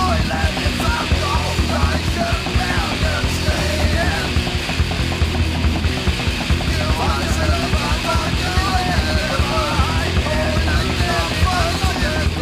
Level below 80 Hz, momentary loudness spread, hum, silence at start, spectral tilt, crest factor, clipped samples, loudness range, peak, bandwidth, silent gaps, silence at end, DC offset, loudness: -24 dBFS; 2 LU; none; 0 s; -4.5 dB/octave; 14 dB; under 0.1%; 1 LU; -4 dBFS; 16 kHz; none; 0 s; under 0.1%; -18 LUFS